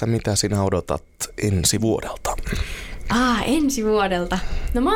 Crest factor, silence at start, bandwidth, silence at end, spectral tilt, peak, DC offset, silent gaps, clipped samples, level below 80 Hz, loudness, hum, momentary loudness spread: 16 dB; 0 s; 17.5 kHz; 0 s; -4.5 dB/octave; -6 dBFS; under 0.1%; none; under 0.1%; -32 dBFS; -22 LUFS; none; 9 LU